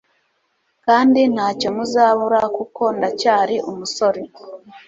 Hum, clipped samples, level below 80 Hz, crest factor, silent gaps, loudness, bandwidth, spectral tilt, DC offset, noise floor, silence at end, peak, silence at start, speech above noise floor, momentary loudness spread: none; under 0.1%; -62 dBFS; 16 dB; none; -17 LUFS; 7.8 kHz; -4.5 dB/octave; under 0.1%; -67 dBFS; 0.1 s; -2 dBFS; 0.85 s; 50 dB; 12 LU